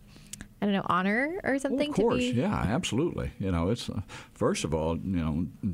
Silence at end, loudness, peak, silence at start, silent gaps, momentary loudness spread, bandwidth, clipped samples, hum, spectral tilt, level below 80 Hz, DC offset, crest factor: 0 s; -29 LUFS; -12 dBFS; 0 s; none; 10 LU; 16 kHz; under 0.1%; none; -5.5 dB/octave; -46 dBFS; under 0.1%; 16 dB